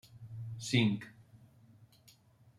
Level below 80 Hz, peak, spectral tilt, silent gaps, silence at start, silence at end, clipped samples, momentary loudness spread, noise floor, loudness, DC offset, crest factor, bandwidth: -72 dBFS; -14 dBFS; -5 dB/octave; none; 0.05 s; 0.75 s; under 0.1%; 20 LU; -64 dBFS; -34 LUFS; under 0.1%; 24 dB; 13.5 kHz